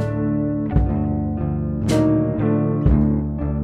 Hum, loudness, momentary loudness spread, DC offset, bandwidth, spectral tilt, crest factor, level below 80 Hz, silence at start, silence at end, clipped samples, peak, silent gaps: none; -20 LUFS; 6 LU; under 0.1%; 11.5 kHz; -8.5 dB/octave; 14 dB; -28 dBFS; 0 s; 0 s; under 0.1%; -4 dBFS; none